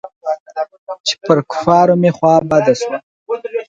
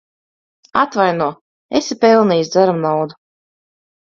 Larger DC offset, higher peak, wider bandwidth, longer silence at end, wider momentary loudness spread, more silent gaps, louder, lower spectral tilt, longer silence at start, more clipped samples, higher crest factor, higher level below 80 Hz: neither; about the same, 0 dBFS vs 0 dBFS; first, 9 kHz vs 7.6 kHz; second, 0.05 s vs 1 s; first, 14 LU vs 9 LU; first, 0.16-0.21 s, 0.40-0.46 s, 0.78-0.87 s, 1.00-1.04 s, 3.03-3.26 s vs 1.41-1.69 s; about the same, -15 LUFS vs -16 LUFS; about the same, -5.5 dB/octave vs -5.5 dB/octave; second, 0.05 s vs 0.75 s; neither; about the same, 14 dB vs 18 dB; about the same, -54 dBFS vs -58 dBFS